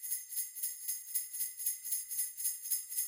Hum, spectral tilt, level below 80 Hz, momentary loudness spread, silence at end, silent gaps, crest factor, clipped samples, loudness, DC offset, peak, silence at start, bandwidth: none; 6.5 dB/octave; under -90 dBFS; 3 LU; 0 s; none; 20 dB; under 0.1%; -35 LUFS; under 0.1%; -18 dBFS; 0 s; 17 kHz